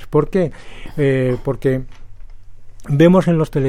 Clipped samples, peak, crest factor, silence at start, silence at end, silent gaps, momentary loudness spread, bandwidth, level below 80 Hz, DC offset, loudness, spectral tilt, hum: under 0.1%; -2 dBFS; 16 dB; 0 s; 0 s; none; 12 LU; 14 kHz; -34 dBFS; under 0.1%; -16 LUFS; -8.5 dB/octave; none